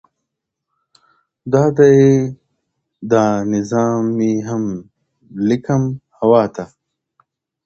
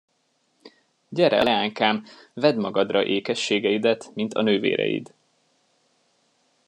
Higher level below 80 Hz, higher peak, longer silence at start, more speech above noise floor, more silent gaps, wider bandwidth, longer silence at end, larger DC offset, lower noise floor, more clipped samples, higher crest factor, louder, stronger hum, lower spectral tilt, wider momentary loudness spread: first, -54 dBFS vs -68 dBFS; first, 0 dBFS vs -4 dBFS; first, 1.45 s vs 0.65 s; first, 64 dB vs 47 dB; neither; second, 7.6 kHz vs 10.5 kHz; second, 1 s vs 1.65 s; neither; first, -78 dBFS vs -69 dBFS; neither; second, 16 dB vs 22 dB; first, -16 LUFS vs -23 LUFS; neither; first, -7.5 dB/octave vs -5 dB/octave; first, 20 LU vs 8 LU